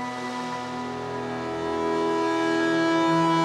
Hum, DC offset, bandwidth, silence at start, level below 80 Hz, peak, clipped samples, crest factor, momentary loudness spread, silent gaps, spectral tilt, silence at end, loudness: none; under 0.1%; 11 kHz; 0 s; -60 dBFS; -12 dBFS; under 0.1%; 12 dB; 10 LU; none; -5.5 dB/octave; 0 s; -25 LUFS